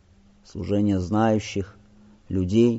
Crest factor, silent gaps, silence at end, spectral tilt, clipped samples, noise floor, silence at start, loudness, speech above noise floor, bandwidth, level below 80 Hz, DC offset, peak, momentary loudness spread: 16 dB; none; 0 s; -7 dB/octave; under 0.1%; -54 dBFS; 0.55 s; -24 LUFS; 32 dB; 8 kHz; -50 dBFS; under 0.1%; -8 dBFS; 15 LU